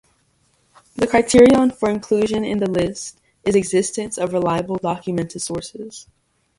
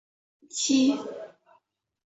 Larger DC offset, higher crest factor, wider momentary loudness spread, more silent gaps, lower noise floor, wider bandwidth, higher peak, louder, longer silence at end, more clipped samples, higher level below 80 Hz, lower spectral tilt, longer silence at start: neither; about the same, 20 dB vs 18 dB; about the same, 20 LU vs 20 LU; neither; second, -62 dBFS vs -67 dBFS; first, 11.5 kHz vs 8.2 kHz; first, 0 dBFS vs -12 dBFS; first, -18 LUFS vs -25 LUFS; second, 0.55 s vs 0.9 s; neither; first, -48 dBFS vs -74 dBFS; first, -5 dB/octave vs -2 dB/octave; first, 0.95 s vs 0.55 s